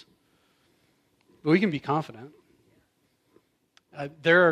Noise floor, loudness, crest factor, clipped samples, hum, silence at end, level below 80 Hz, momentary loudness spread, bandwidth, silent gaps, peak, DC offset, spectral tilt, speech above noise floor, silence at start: -70 dBFS; -25 LUFS; 20 dB; under 0.1%; none; 0 s; -74 dBFS; 26 LU; 10 kHz; none; -8 dBFS; under 0.1%; -7 dB/octave; 46 dB; 1.45 s